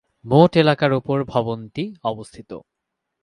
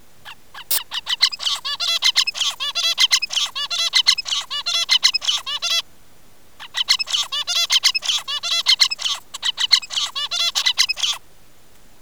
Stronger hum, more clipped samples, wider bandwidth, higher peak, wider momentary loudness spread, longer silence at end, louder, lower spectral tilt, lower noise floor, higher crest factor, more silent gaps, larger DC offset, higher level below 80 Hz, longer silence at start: neither; neither; second, 10.5 kHz vs over 20 kHz; about the same, 0 dBFS vs 0 dBFS; first, 22 LU vs 8 LU; second, 0.65 s vs 0.85 s; about the same, -19 LUFS vs -17 LUFS; first, -7.5 dB/octave vs 3.5 dB/octave; first, -80 dBFS vs -52 dBFS; about the same, 20 dB vs 22 dB; neither; second, under 0.1% vs 0.8%; first, -54 dBFS vs -60 dBFS; about the same, 0.25 s vs 0.25 s